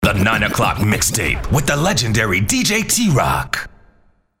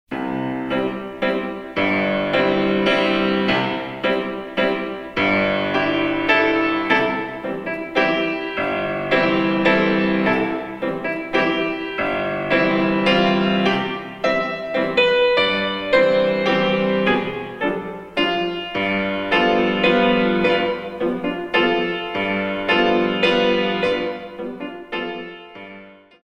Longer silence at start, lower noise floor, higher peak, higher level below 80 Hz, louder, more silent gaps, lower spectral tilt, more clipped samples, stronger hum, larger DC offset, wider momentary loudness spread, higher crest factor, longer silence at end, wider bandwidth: about the same, 0 s vs 0.1 s; first, -56 dBFS vs -43 dBFS; about the same, 0 dBFS vs -2 dBFS; first, -32 dBFS vs -50 dBFS; first, -16 LUFS vs -19 LUFS; neither; second, -4 dB/octave vs -6.5 dB/octave; neither; neither; neither; second, 4 LU vs 10 LU; about the same, 16 dB vs 18 dB; first, 0.7 s vs 0.3 s; first, 16.5 kHz vs 9.4 kHz